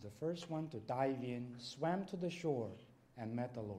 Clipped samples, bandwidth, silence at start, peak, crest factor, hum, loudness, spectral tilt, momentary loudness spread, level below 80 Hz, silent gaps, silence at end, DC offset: under 0.1%; 14 kHz; 0 s; -24 dBFS; 18 dB; none; -42 LUFS; -6.5 dB/octave; 10 LU; -76 dBFS; none; 0 s; under 0.1%